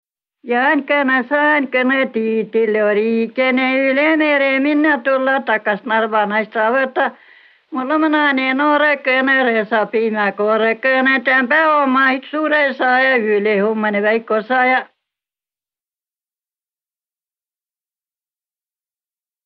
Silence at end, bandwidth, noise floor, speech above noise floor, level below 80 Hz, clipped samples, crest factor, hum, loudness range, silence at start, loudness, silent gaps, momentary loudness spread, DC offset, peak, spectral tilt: 4.6 s; 5.8 kHz; under -90 dBFS; over 75 dB; -72 dBFS; under 0.1%; 14 dB; none; 4 LU; 0.45 s; -15 LUFS; none; 5 LU; under 0.1%; -2 dBFS; -7.5 dB/octave